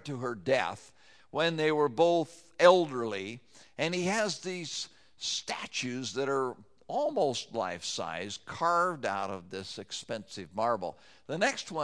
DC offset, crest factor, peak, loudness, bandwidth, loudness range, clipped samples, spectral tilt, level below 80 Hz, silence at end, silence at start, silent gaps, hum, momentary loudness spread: under 0.1%; 24 dB; -6 dBFS; -31 LUFS; 11 kHz; 6 LU; under 0.1%; -4 dB/octave; -74 dBFS; 0 s; 0.05 s; none; none; 14 LU